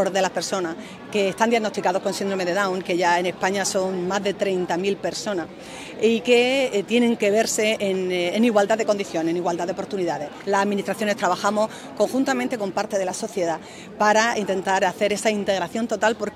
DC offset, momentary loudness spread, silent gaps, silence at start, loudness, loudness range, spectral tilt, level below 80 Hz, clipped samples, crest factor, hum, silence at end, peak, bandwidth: under 0.1%; 8 LU; none; 0 s; -22 LUFS; 3 LU; -4 dB/octave; -64 dBFS; under 0.1%; 18 dB; none; 0 s; -4 dBFS; 16 kHz